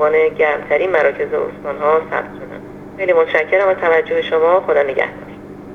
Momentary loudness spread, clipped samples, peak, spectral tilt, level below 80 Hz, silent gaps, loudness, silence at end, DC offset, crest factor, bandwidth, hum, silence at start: 18 LU; under 0.1%; 0 dBFS; -6 dB/octave; -52 dBFS; none; -16 LUFS; 0 s; under 0.1%; 16 dB; 6.4 kHz; 50 Hz at -40 dBFS; 0 s